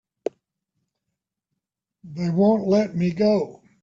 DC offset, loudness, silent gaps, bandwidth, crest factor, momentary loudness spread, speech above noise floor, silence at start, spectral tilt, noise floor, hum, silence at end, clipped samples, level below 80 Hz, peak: under 0.1%; -21 LUFS; none; 7.4 kHz; 16 dB; 14 LU; 62 dB; 2.05 s; -8 dB/octave; -82 dBFS; none; 0.3 s; under 0.1%; -62 dBFS; -8 dBFS